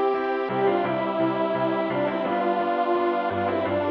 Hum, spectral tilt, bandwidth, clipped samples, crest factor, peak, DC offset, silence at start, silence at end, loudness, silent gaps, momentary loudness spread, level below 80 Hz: none; -8.5 dB/octave; 5.6 kHz; under 0.1%; 14 dB; -10 dBFS; under 0.1%; 0 s; 0 s; -24 LUFS; none; 2 LU; -64 dBFS